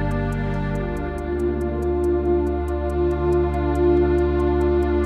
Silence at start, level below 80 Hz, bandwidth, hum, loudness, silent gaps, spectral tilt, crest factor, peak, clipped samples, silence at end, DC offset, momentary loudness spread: 0 s; -28 dBFS; 9.6 kHz; none; -22 LUFS; none; -9 dB/octave; 12 dB; -8 dBFS; under 0.1%; 0 s; under 0.1%; 7 LU